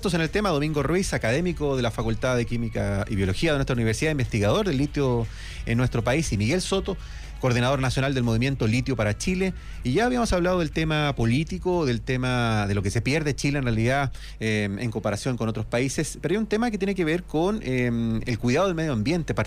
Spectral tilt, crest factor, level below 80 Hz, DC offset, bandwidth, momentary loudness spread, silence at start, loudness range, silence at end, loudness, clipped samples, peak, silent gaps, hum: -6 dB/octave; 12 dB; -38 dBFS; under 0.1%; 15 kHz; 4 LU; 0 s; 2 LU; 0 s; -25 LUFS; under 0.1%; -12 dBFS; none; none